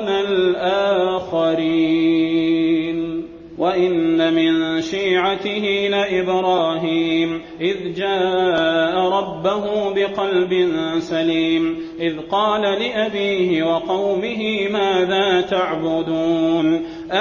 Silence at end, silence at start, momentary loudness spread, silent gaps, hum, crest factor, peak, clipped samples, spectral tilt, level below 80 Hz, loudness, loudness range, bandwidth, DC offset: 0 s; 0 s; 5 LU; none; none; 12 dB; -6 dBFS; under 0.1%; -6 dB/octave; -54 dBFS; -19 LUFS; 1 LU; 7.2 kHz; under 0.1%